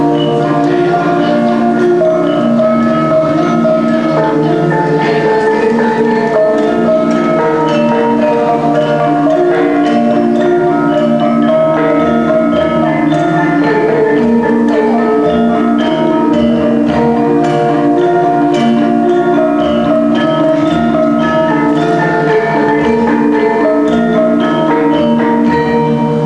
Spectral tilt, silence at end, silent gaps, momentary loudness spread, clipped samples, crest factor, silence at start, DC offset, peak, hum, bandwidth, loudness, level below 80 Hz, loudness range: -7.5 dB/octave; 0 s; none; 1 LU; under 0.1%; 10 dB; 0 s; 0.4%; 0 dBFS; none; 10.5 kHz; -11 LUFS; -42 dBFS; 0 LU